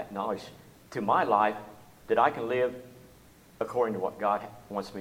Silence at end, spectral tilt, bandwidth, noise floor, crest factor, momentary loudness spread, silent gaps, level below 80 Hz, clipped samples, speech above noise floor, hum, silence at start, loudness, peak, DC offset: 0 s; -6 dB/octave; 16.5 kHz; -56 dBFS; 20 dB; 15 LU; none; -66 dBFS; under 0.1%; 27 dB; none; 0 s; -29 LUFS; -10 dBFS; under 0.1%